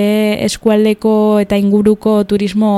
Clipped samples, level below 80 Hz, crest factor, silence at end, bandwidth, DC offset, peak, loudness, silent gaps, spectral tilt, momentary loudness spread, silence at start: under 0.1%; -42 dBFS; 12 dB; 0 s; 13 kHz; under 0.1%; 0 dBFS; -12 LUFS; none; -6 dB/octave; 3 LU; 0 s